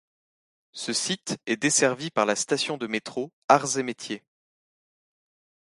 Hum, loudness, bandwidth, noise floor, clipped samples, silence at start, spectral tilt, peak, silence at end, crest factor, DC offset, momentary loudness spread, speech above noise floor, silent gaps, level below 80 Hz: none; -25 LUFS; 11.5 kHz; under -90 dBFS; under 0.1%; 0.75 s; -2.5 dB/octave; -2 dBFS; 1.55 s; 26 dB; under 0.1%; 14 LU; over 64 dB; 3.33-3.48 s; -72 dBFS